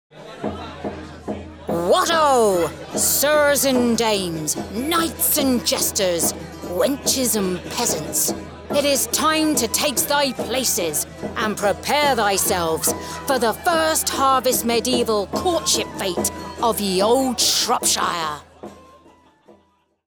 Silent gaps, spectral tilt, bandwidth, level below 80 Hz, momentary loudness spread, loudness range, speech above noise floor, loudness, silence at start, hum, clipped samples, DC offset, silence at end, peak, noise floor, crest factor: none; -2.5 dB/octave; over 20 kHz; -48 dBFS; 11 LU; 2 LU; 41 dB; -19 LUFS; 0.15 s; none; under 0.1%; under 0.1%; 1.25 s; -6 dBFS; -61 dBFS; 14 dB